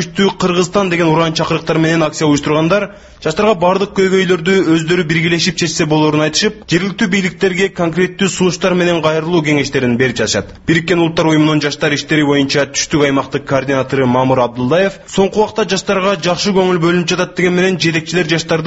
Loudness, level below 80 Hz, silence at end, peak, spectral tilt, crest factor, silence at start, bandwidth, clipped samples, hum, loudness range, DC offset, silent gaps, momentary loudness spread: -13 LUFS; -42 dBFS; 0 s; 0 dBFS; -5 dB/octave; 14 dB; 0 s; 8.2 kHz; under 0.1%; none; 1 LU; under 0.1%; none; 3 LU